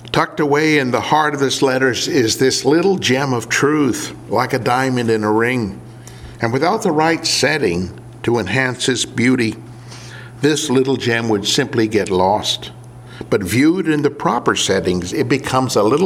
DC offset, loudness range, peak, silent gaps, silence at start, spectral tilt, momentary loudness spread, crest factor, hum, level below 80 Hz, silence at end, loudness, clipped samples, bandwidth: under 0.1%; 3 LU; 0 dBFS; none; 0 s; -4.5 dB/octave; 10 LU; 16 dB; none; -50 dBFS; 0 s; -16 LUFS; under 0.1%; 16.5 kHz